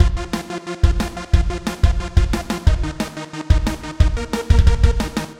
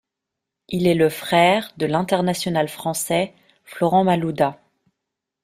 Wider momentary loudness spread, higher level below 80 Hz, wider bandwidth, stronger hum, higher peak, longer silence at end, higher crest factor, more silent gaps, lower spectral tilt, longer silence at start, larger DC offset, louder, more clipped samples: first, 10 LU vs 7 LU; first, -18 dBFS vs -58 dBFS; about the same, 15 kHz vs 16 kHz; neither; first, 0 dBFS vs -4 dBFS; second, 0.05 s vs 0.9 s; about the same, 16 dB vs 18 dB; neither; about the same, -6 dB/octave vs -5 dB/octave; second, 0 s vs 0.7 s; neither; about the same, -20 LUFS vs -20 LUFS; neither